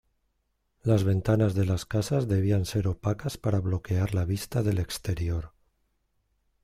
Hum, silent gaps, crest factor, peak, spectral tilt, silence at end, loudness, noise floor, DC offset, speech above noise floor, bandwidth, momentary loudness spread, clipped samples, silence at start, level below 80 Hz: none; none; 16 dB; -10 dBFS; -7 dB/octave; 1.15 s; -28 LUFS; -75 dBFS; under 0.1%; 49 dB; 15 kHz; 6 LU; under 0.1%; 0.85 s; -48 dBFS